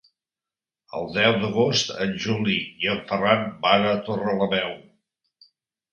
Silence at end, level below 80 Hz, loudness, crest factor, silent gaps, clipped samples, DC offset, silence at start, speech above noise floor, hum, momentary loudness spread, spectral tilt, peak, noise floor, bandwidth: 1.1 s; -60 dBFS; -23 LUFS; 24 dB; none; under 0.1%; under 0.1%; 0.95 s; over 67 dB; none; 8 LU; -4.5 dB/octave; -2 dBFS; under -90 dBFS; 7.8 kHz